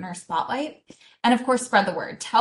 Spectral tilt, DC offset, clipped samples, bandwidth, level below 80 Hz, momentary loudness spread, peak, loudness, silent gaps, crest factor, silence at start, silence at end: -3.5 dB/octave; under 0.1%; under 0.1%; 12 kHz; -68 dBFS; 10 LU; -6 dBFS; -23 LUFS; none; 18 dB; 0 s; 0 s